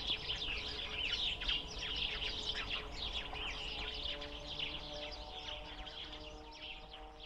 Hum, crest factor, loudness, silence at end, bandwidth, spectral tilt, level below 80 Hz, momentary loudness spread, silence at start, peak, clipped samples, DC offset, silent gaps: none; 20 dB; -40 LUFS; 0 s; 13 kHz; -2.5 dB/octave; -52 dBFS; 12 LU; 0 s; -22 dBFS; under 0.1%; under 0.1%; none